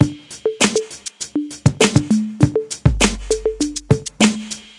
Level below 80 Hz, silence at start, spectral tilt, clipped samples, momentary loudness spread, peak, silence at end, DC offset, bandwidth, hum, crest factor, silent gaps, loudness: -32 dBFS; 0 s; -4.5 dB/octave; under 0.1%; 10 LU; 0 dBFS; 0.15 s; under 0.1%; 11.5 kHz; none; 18 dB; none; -18 LUFS